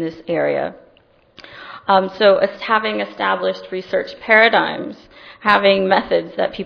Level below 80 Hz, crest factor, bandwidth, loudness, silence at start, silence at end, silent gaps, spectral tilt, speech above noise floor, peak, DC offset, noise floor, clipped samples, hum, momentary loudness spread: -56 dBFS; 18 dB; 5.4 kHz; -17 LUFS; 0 s; 0 s; none; -6.5 dB/octave; 36 dB; 0 dBFS; under 0.1%; -53 dBFS; under 0.1%; none; 15 LU